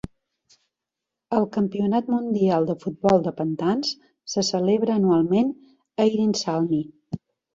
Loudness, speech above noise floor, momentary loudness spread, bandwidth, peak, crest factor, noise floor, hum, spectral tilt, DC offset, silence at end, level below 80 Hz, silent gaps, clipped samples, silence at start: -23 LUFS; 64 dB; 15 LU; 7.8 kHz; -6 dBFS; 18 dB; -85 dBFS; none; -6 dB/octave; under 0.1%; 0.35 s; -58 dBFS; none; under 0.1%; 1.3 s